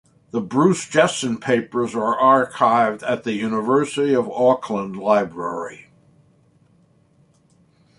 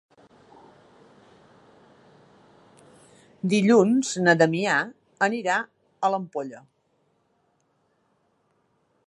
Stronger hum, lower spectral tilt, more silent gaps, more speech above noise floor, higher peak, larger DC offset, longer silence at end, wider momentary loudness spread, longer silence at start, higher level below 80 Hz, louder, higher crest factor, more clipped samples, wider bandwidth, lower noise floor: neither; about the same, -5 dB/octave vs -5 dB/octave; neither; second, 38 dB vs 47 dB; about the same, -2 dBFS vs -4 dBFS; neither; second, 2.2 s vs 2.5 s; second, 11 LU vs 16 LU; second, 0.35 s vs 3.45 s; first, -64 dBFS vs -74 dBFS; first, -20 LUFS vs -23 LUFS; about the same, 18 dB vs 22 dB; neither; about the same, 11.5 kHz vs 11.5 kHz; second, -57 dBFS vs -69 dBFS